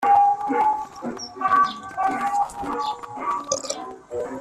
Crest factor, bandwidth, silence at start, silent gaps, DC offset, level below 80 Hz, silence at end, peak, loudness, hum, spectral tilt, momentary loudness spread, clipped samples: 20 dB; 13 kHz; 0 s; none; under 0.1%; -58 dBFS; 0 s; -4 dBFS; -24 LUFS; none; -2.5 dB/octave; 13 LU; under 0.1%